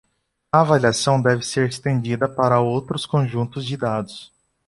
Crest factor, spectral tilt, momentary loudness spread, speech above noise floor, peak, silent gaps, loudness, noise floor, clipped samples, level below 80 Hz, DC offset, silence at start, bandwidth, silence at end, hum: 18 dB; -5.5 dB/octave; 9 LU; 22 dB; -2 dBFS; none; -20 LUFS; -42 dBFS; under 0.1%; -54 dBFS; under 0.1%; 0.55 s; 11.5 kHz; 0.45 s; none